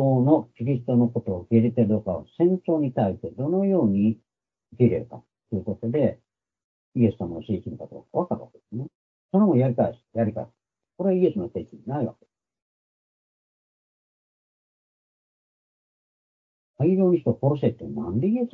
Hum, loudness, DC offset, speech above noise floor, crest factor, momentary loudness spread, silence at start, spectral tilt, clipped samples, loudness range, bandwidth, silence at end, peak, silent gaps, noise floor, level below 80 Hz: none; -24 LUFS; under 0.1%; over 67 dB; 20 dB; 13 LU; 0 s; -12 dB/octave; under 0.1%; 7 LU; 4 kHz; 0.05 s; -6 dBFS; 6.64-6.92 s, 8.95-9.29 s, 12.62-16.74 s; under -90 dBFS; -62 dBFS